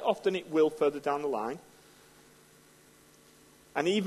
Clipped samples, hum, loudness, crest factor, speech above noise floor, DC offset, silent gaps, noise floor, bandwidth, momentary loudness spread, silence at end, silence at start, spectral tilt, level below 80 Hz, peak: under 0.1%; none; -30 LUFS; 20 dB; 30 dB; under 0.1%; none; -59 dBFS; 13 kHz; 11 LU; 0 s; 0 s; -5 dB/octave; -74 dBFS; -12 dBFS